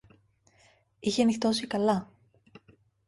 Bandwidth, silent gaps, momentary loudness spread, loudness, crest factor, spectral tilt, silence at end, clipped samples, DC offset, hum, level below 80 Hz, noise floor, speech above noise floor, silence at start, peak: 11.5 kHz; none; 7 LU; -28 LUFS; 18 dB; -5 dB/octave; 1.05 s; under 0.1%; under 0.1%; none; -66 dBFS; -64 dBFS; 38 dB; 1.05 s; -12 dBFS